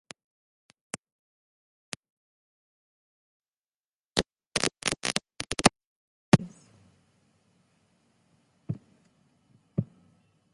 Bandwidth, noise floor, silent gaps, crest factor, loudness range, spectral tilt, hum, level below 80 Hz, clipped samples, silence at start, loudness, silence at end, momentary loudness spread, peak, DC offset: 11.5 kHz; under -90 dBFS; 4.47-4.51 s, 5.87-6.32 s; 34 dB; 20 LU; -4 dB/octave; none; -58 dBFS; under 0.1%; 4.15 s; -29 LUFS; 0.7 s; 19 LU; 0 dBFS; under 0.1%